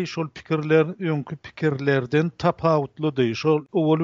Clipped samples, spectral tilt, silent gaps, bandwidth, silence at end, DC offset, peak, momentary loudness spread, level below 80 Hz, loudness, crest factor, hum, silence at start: under 0.1%; -6 dB/octave; none; 7.4 kHz; 0 s; under 0.1%; -6 dBFS; 7 LU; -58 dBFS; -23 LUFS; 18 dB; none; 0 s